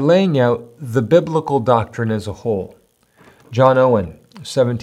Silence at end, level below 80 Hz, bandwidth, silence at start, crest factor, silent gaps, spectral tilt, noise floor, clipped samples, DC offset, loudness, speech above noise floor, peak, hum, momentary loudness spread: 0 s; -54 dBFS; 12.5 kHz; 0 s; 16 dB; none; -7.5 dB/octave; -53 dBFS; under 0.1%; under 0.1%; -17 LUFS; 37 dB; 0 dBFS; none; 11 LU